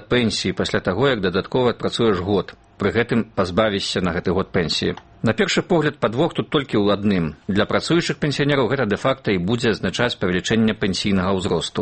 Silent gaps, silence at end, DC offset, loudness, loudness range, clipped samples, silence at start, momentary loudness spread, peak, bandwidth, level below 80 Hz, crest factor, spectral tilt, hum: none; 0 s; under 0.1%; -20 LUFS; 1 LU; under 0.1%; 0 s; 4 LU; -2 dBFS; 8.8 kHz; -46 dBFS; 18 dB; -5.5 dB/octave; none